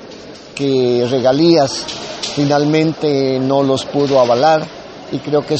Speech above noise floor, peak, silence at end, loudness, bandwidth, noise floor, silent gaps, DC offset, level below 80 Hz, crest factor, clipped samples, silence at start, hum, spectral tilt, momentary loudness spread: 20 dB; -2 dBFS; 0 s; -14 LUFS; 8.8 kHz; -34 dBFS; none; under 0.1%; -52 dBFS; 14 dB; under 0.1%; 0 s; none; -5.5 dB/octave; 14 LU